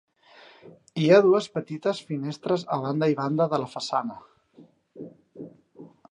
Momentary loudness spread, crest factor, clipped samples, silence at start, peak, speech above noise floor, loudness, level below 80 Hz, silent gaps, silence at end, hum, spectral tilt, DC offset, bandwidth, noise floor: 26 LU; 22 dB; under 0.1%; 0.65 s; -4 dBFS; 31 dB; -24 LUFS; -74 dBFS; none; 0.25 s; none; -6.5 dB/octave; under 0.1%; 10.5 kHz; -55 dBFS